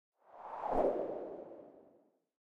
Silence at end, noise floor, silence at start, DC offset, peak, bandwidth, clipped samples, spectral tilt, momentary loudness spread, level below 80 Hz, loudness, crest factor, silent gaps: 0.55 s; -70 dBFS; 0.3 s; under 0.1%; -20 dBFS; 8 kHz; under 0.1%; -8 dB/octave; 21 LU; -58 dBFS; -38 LUFS; 20 dB; none